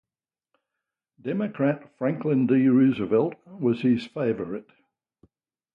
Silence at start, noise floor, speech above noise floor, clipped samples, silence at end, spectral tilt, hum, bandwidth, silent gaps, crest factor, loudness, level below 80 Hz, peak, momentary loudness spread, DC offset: 1.25 s; under -90 dBFS; over 66 dB; under 0.1%; 1.1 s; -9.5 dB/octave; none; 5.4 kHz; none; 16 dB; -24 LUFS; -66 dBFS; -10 dBFS; 12 LU; under 0.1%